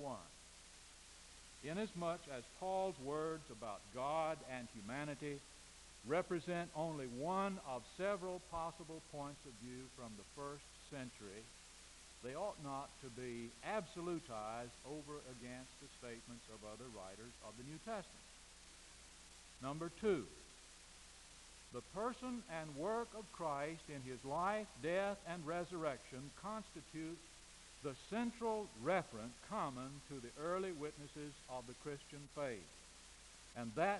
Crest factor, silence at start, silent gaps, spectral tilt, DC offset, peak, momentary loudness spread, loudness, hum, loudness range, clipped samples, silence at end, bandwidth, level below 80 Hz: 24 dB; 0 s; none; -4.5 dB/octave; under 0.1%; -24 dBFS; 17 LU; -46 LUFS; none; 9 LU; under 0.1%; 0 s; 11.5 kHz; -68 dBFS